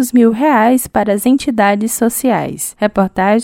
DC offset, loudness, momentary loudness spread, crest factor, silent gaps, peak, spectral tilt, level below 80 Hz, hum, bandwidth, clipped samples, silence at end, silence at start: under 0.1%; -13 LUFS; 5 LU; 12 dB; none; 0 dBFS; -5 dB/octave; -46 dBFS; none; 17 kHz; under 0.1%; 0 s; 0 s